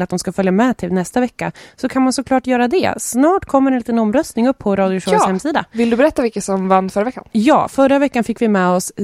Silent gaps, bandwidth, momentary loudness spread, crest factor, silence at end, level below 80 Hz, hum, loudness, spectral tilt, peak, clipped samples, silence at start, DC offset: none; 15 kHz; 6 LU; 14 dB; 0 s; -48 dBFS; none; -16 LUFS; -5.5 dB/octave; 0 dBFS; under 0.1%; 0 s; under 0.1%